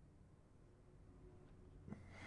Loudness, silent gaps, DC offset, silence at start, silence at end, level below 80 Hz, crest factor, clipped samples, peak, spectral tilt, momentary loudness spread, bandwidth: -63 LUFS; none; under 0.1%; 0 s; 0 s; -68 dBFS; 24 dB; under 0.1%; -36 dBFS; -6.5 dB/octave; 11 LU; 10.5 kHz